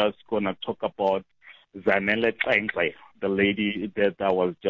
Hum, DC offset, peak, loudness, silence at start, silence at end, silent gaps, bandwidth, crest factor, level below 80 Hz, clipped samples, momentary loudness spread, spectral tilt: none; under 0.1%; -6 dBFS; -25 LUFS; 0 s; 0 s; none; 7 kHz; 20 dB; -58 dBFS; under 0.1%; 8 LU; -7.5 dB/octave